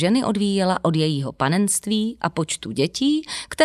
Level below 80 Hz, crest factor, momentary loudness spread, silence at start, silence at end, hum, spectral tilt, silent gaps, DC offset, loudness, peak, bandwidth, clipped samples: -54 dBFS; 18 dB; 5 LU; 0 s; 0 s; none; -4.5 dB/octave; none; under 0.1%; -22 LUFS; -2 dBFS; 14 kHz; under 0.1%